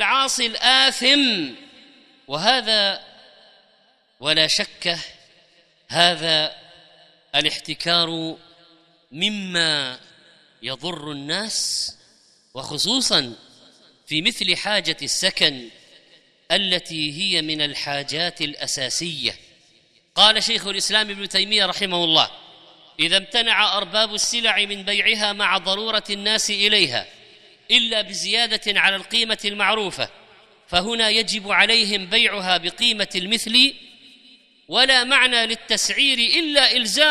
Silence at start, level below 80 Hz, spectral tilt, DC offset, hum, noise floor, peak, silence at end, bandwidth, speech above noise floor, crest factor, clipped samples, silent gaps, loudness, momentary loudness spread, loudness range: 0 s; -58 dBFS; -1.5 dB/octave; under 0.1%; none; -60 dBFS; 0 dBFS; 0 s; 14.5 kHz; 39 dB; 22 dB; under 0.1%; none; -18 LUFS; 11 LU; 6 LU